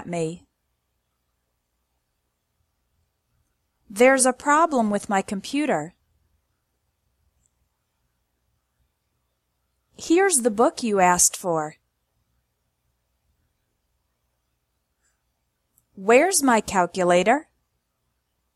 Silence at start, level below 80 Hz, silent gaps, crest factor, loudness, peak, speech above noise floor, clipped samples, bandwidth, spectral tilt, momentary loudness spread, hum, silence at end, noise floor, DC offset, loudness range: 0 s; -62 dBFS; none; 22 dB; -20 LUFS; -2 dBFS; 55 dB; under 0.1%; 15.5 kHz; -3.5 dB/octave; 13 LU; 60 Hz at -60 dBFS; 1.15 s; -75 dBFS; under 0.1%; 10 LU